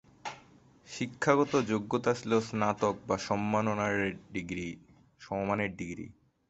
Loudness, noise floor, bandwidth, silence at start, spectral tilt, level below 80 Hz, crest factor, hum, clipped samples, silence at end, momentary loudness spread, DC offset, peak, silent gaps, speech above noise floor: -31 LUFS; -59 dBFS; 8.2 kHz; 0.25 s; -5.5 dB/octave; -62 dBFS; 22 dB; none; under 0.1%; 0.4 s; 16 LU; under 0.1%; -10 dBFS; none; 28 dB